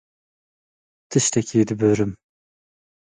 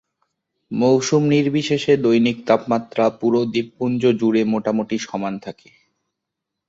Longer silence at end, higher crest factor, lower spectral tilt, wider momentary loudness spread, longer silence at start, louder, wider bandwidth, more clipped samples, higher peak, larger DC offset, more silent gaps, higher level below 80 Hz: second, 1 s vs 1.15 s; about the same, 18 dB vs 18 dB; about the same, -5 dB/octave vs -6 dB/octave; second, 5 LU vs 9 LU; first, 1.1 s vs 0.7 s; about the same, -20 LUFS vs -19 LUFS; first, 9.6 kHz vs 7.8 kHz; neither; second, -6 dBFS vs -2 dBFS; neither; neither; first, -54 dBFS vs -62 dBFS